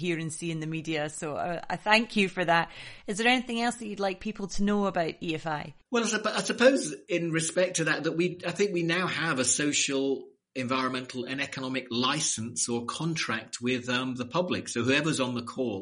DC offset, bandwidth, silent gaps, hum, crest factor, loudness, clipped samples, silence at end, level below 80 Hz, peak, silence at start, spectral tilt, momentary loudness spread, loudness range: under 0.1%; 10.5 kHz; none; none; 22 dB; -28 LUFS; under 0.1%; 0 s; -54 dBFS; -6 dBFS; 0 s; -3.5 dB/octave; 9 LU; 3 LU